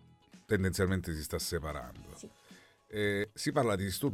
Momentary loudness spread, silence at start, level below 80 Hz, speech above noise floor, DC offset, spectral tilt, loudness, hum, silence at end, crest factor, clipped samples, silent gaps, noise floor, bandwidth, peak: 19 LU; 0.35 s; -52 dBFS; 26 dB; under 0.1%; -5 dB/octave; -34 LUFS; none; 0 s; 18 dB; under 0.1%; none; -59 dBFS; 17 kHz; -16 dBFS